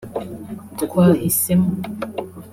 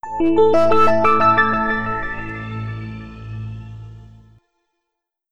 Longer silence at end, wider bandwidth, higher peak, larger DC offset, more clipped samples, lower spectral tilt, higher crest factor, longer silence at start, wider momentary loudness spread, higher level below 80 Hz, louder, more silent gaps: about the same, 0 s vs 0 s; first, 16 kHz vs 9.8 kHz; about the same, -4 dBFS vs -2 dBFS; neither; neither; about the same, -6 dB/octave vs -7 dB/octave; about the same, 16 dB vs 16 dB; about the same, 0 s vs 0 s; about the same, 17 LU vs 19 LU; second, -52 dBFS vs -40 dBFS; about the same, -19 LUFS vs -17 LUFS; neither